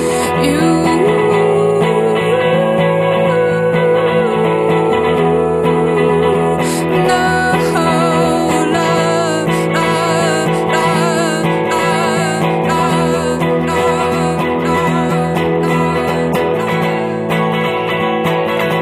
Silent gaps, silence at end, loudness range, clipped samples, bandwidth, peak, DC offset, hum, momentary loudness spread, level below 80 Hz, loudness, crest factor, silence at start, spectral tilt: none; 0 s; 2 LU; under 0.1%; 15 kHz; 0 dBFS; under 0.1%; none; 3 LU; -42 dBFS; -13 LUFS; 12 dB; 0 s; -5.5 dB/octave